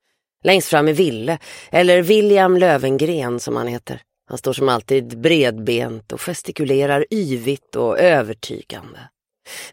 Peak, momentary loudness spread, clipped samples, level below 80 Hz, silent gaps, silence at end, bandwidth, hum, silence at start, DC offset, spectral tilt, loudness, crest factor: 0 dBFS; 17 LU; under 0.1%; -60 dBFS; none; 0.05 s; 16.5 kHz; none; 0.45 s; under 0.1%; -5 dB/octave; -17 LUFS; 18 dB